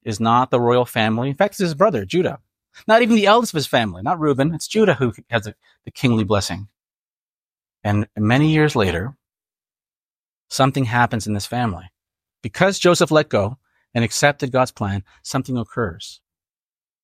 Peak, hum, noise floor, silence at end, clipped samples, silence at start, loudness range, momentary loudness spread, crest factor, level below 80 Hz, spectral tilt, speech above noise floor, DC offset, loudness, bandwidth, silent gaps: -2 dBFS; none; under -90 dBFS; 0.9 s; under 0.1%; 0.05 s; 5 LU; 13 LU; 18 dB; -54 dBFS; -5.5 dB/octave; over 72 dB; under 0.1%; -19 LUFS; 16 kHz; 6.95-7.49 s, 9.97-10.02 s, 10.10-10.44 s